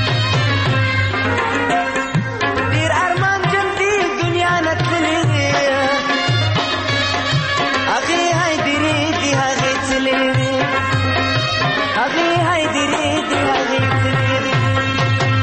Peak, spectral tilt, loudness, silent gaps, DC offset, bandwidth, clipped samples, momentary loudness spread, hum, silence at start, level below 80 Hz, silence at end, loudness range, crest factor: -4 dBFS; -4.5 dB/octave; -16 LUFS; none; under 0.1%; 8.8 kHz; under 0.1%; 2 LU; none; 0 s; -42 dBFS; 0 s; 1 LU; 12 dB